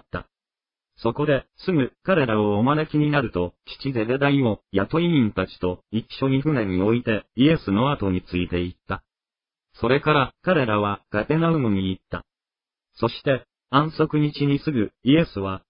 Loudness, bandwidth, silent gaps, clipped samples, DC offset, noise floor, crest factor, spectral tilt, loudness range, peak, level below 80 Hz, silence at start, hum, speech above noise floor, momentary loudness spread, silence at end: -23 LUFS; 5.4 kHz; none; under 0.1%; under 0.1%; under -90 dBFS; 18 dB; -11.5 dB/octave; 2 LU; -4 dBFS; -48 dBFS; 0.15 s; none; over 68 dB; 9 LU; 0.1 s